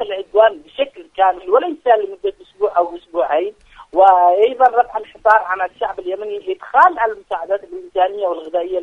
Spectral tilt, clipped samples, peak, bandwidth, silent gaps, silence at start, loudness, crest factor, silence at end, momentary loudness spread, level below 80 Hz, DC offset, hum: -4.5 dB/octave; under 0.1%; 0 dBFS; 5.6 kHz; none; 0 s; -17 LUFS; 16 dB; 0 s; 12 LU; -56 dBFS; under 0.1%; none